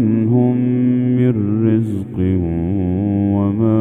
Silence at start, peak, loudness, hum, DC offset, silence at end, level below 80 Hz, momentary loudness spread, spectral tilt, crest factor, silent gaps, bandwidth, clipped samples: 0 s; -2 dBFS; -16 LUFS; none; under 0.1%; 0 s; -40 dBFS; 4 LU; -11.5 dB/octave; 12 dB; none; 3.6 kHz; under 0.1%